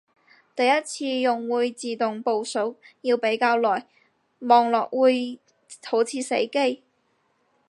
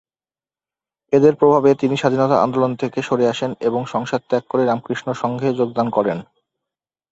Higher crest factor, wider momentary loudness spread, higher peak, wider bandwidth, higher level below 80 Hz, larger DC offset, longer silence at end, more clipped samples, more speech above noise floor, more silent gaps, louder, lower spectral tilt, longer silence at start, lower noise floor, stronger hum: about the same, 20 dB vs 18 dB; first, 12 LU vs 9 LU; second, -4 dBFS vs 0 dBFS; first, 11.5 kHz vs 8 kHz; second, -84 dBFS vs -60 dBFS; neither; about the same, 0.95 s vs 0.9 s; neither; second, 46 dB vs over 73 dB; neither; second, -23 LUFS vs -18 LUFS; second, -3 dB/octave vs -7 dB/octave; second, 0.55 s vs 1.1 s; second, -69 dBFS vs under -90 dBFS; neither